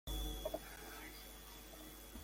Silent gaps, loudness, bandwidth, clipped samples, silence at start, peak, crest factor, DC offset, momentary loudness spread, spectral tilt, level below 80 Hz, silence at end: none; -49 LUFS; 17 kHz; under 0.1%; 0.05 s; -30 dBFS; 18 dB; under 0.1%; 9 LU; -3.5 dB/octave; -52 dBFS; 0 s